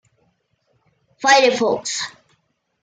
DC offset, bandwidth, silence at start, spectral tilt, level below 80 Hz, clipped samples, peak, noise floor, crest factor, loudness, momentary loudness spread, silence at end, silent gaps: under 0.1%; 9.6 kHz; 1.2 s; -1.5 dB/octave; -68 dBFS; under 0.1%; -4 dBFS; -67 dBFS; 18 dB; -17 LUFS; 12 LU; 0.75 s; none